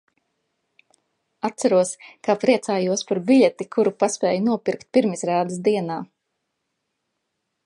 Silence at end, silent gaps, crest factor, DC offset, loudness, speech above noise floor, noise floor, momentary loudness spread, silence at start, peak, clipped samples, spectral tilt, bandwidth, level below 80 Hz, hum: 1.6 s; none; 20 dB; under 0.1%; -21 LUFS; 57 dB; -77 dBFS; 10 LU; 1.45 s; -4 dBFS; under 0.1%; -5 dB/octave; 11.5 kHz; -74 dBFS; none